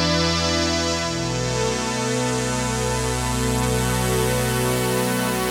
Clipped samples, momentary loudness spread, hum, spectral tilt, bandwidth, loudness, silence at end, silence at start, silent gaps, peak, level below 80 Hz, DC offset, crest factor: under 0.1%; 3 LU; none; -4 dB/octave; 18 kHz; -21 LUFS; 0 s; 0 s; none; -8 dBFS; -34 dBFS; under 0.1%; 14 dB